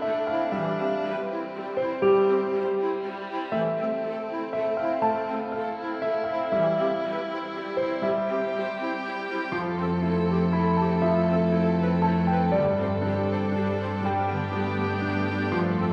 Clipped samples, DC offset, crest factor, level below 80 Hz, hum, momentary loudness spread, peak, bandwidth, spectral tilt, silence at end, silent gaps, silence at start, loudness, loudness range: under 0.1%; under 0.1%; 14 dB; -60 dBFS; none; 8 LU; -10 dBFS; 6.2 kHz; -9 dB/octave; 0 s; none; 0 s; -26 LUFS; 4 LU